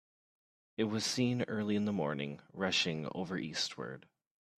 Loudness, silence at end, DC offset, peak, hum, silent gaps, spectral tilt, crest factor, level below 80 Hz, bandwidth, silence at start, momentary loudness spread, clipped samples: -35 LUFS; 0.6 s; under 0.1%; -18 dBFS; none; none; -4.5 dB/octave; 18 dB; -74 dBFS; 14 kHz; 0.8 s; 12 LU; under 0.1%